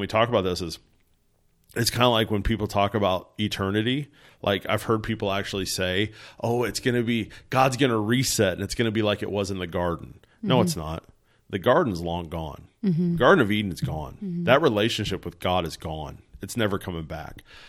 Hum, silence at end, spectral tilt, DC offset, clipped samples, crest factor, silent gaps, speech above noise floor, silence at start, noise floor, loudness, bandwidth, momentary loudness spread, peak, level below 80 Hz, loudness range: none; 0 s; -5 dB/octave; under 0.1%; under 0.1%; 22 dB; none; 40 dB; 0 s; -65 dBFS; -25 LUFS; 16.5 kHz; 14 LU; -2 dBFS; -46 dBFS; 3 LU